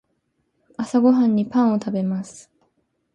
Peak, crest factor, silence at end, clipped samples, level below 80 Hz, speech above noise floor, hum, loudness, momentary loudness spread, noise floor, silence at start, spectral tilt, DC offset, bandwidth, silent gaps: -6 dBFS; 16 dB; 0.75 s; under 0.1%; -66 dBFS; 51 dB; none; -20 LUFS; 16 LU; -71 dBFS; 0.8 s; -7.5 dB/octave; under 0.1%; 9.4 kHz; none